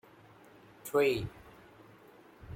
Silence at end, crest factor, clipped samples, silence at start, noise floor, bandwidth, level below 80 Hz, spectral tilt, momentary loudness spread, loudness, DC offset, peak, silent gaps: 0 s; 20 dB; under 0.1%; 0.85 s; -58 dBFS; 16.5 kHz; -62 dBFS; -5.5 dB/octave; 27 LU; -32 LUFS; under 0.1%; -18 dBFS; none